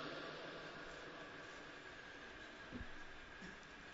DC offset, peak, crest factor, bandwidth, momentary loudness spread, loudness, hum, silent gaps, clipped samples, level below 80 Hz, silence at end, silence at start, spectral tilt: under 0.1%; -36 dBFS; 18 dB; 7.6 kHz; 4 LU; -53 LUFS; none; none; under 0.1%; -64 dBFS; 0 s; 0 s; -2 dB/octave